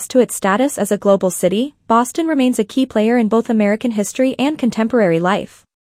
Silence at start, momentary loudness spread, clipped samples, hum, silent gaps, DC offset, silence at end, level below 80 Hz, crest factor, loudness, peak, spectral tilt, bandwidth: 0 s; 4 LU; under 0.1%; none; none; under 0.1%; 0.4 s; -58 dBFS; 14 dB; -16 LUFS; -2 dBFS; -5 dB/octave; 15.5 kHz